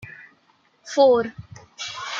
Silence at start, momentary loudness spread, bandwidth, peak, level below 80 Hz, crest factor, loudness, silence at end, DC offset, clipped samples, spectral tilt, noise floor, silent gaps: 0 s; 24 LU; 7.6 kHz; -4 dBFS; -62 dBFS; 18 dB; -21 LUFS; 0 s; under 0.1%; under 0.1%; -4 dB/octave; -62 dBFS; none